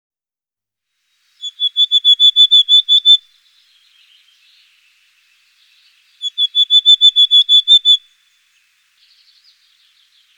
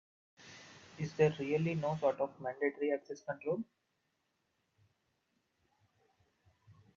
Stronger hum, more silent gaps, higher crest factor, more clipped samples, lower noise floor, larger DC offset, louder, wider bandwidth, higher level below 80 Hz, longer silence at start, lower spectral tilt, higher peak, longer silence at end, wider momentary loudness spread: first, 50 Hz at -95 dBFS vs none; neither; second, 14 dB vs 24 dB; neither; first, under -90 dBFS vs -82 dBFS; neither; first, -8 LUFS vs -36 LUFS; first, 18.5 kHz vs 7.4 kHz; second, -82 dBFS vs -76 dBFS; first, 1.45 s vs 0.4 s; second, 9 dB/octave vs -7 dB/octave; first, 0 dBFS vs -16 dBFS; first, 2.4 s vs 0.25 s; second, 12 LU vs 22 LU